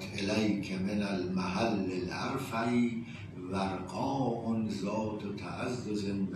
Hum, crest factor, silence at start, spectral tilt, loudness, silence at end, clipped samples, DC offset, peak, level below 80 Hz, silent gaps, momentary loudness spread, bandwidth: none; 16 dB; 0 s; -6 dB/octave; -34 LUFS; 0 s; under 0.1%; under 0.1%; -18 dBFS; -62 dBFS; none; 7 LU; 13.5 kHz